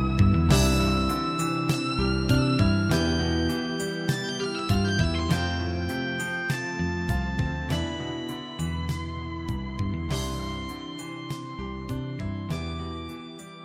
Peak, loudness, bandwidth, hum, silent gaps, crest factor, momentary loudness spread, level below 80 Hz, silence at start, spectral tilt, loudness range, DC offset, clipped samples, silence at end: -8 dBFS; -27 LUFS; 16 kHz; none; none; 18 dB; 13 LU; -36 dBFS; 0 s; -5.5 dB/octave; 9 LU; under 0.1%; under 0.1%; 0 s